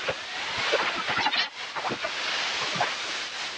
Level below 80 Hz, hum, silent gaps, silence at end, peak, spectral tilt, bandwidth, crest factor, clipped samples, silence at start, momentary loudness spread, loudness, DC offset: -66 dBFS; none; none; 0 s; -10 dBFS; -1.5 dB/octave; 11 kHz; 20 dB; under 0.1%; 0 s; 6 LU; -27 LUFS; under 0.1%